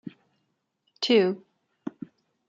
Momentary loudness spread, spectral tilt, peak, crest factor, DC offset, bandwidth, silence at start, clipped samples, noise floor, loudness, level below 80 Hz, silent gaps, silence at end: 24 LU; -5 dB/octave; -10 dBFS; 20 dB; under 0.1%; 7.6 kHz; 0.05 s; under 0.1%; -76 dBFS; -24 LUFS; -82 dBFS; none; 0.6 s